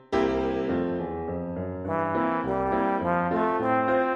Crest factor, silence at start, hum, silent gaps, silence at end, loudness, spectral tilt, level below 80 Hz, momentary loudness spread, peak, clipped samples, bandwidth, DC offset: 14 dB; 0.1 s; none; none; 0 s; -27 LUFS; -8 dB/octave; -50 dBFS; 8 LU; -12 dBFS; under 0.1%; 7.6 kHz; under 0.1%